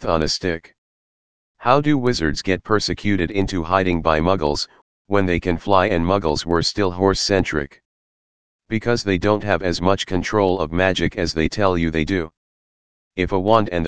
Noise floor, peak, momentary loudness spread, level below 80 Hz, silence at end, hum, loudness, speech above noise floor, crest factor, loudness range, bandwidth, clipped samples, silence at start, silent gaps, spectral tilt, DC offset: under -90 dBFS; 0 dBFS; 7 LU; -38 dBFS; 0 s; none; -20 LUFS; over 71 dB; 20 dB; 2 LU; 10 kHz; under 0.1%; 0 s; 0.78-1.55 s, 4.82-5.05 s, 7.85-8.59 s, 12.37-13.11 s; -5.5 dB/octave; 2%